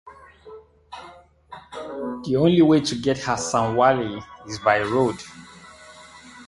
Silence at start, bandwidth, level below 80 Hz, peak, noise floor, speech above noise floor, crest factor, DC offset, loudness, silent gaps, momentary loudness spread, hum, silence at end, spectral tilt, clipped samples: 0.05 s; 11.5 kHz; -54 dBFS; -2 dBFS; -47 dBFS; 27 dB; 20 dB; under 0.1%; -21 LUFS; none; 25 LU; none; 0.05 s; -5.5 dB/octave; under 0.1%